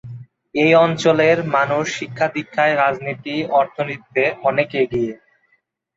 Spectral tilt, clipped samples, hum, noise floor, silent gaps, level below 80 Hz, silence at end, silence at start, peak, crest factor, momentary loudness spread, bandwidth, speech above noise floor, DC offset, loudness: -5.5 dB/octave; under 0.1%; none; -65 dBFS; none; -58 dBFS; 0.8 s; 0.05 s; -2 dBFS; 16 dB; 11 LU; 7.8 kHz; 47 dB; under 0.1%; -18 LUFS